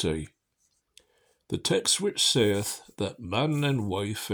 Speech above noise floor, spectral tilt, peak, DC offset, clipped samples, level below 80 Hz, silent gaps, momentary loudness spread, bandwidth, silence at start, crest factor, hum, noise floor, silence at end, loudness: 46 dB; -3.5 dB/octave; -10 dBFS; under 0.1%; under 0.1%; -54 dBFS; none; 12 LU; over 20 kHz; 0 s; 18 dB; none; -74 dBFS; 0 s; -27 LUFS